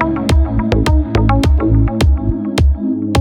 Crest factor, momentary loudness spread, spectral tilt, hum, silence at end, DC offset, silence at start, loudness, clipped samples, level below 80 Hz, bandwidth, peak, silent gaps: 12 dB; 3 LU; -7 dB/octave; none; 0 s; under 0.1%; 0 s; -14 LUFS; under 0.1%; -16 dBFS; 12 kHz; 0 dBFS; none